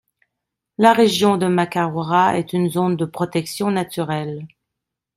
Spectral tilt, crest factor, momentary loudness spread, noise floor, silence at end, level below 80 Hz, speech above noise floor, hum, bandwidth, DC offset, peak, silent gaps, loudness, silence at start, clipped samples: -5.5 dB/octave; 18 dB; 10 LU; -82 dBFS; 0.7 s; -60 dBFS; 64 dB; none; 15.5 kHz; under 0.1%; -2 dBFS; none; -18 LUFS; 0.8 s; under 0.1%